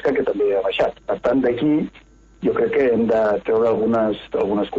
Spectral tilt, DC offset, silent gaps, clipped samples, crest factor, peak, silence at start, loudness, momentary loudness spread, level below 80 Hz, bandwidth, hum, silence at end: -7.5 dB/octave; under 0.1%; none; under 0.1%; 12 dB; -8 dBFS; 0 s; -20 LUFS; 5 LU; -50 dBFS; 7.4 kHz; none; 0 s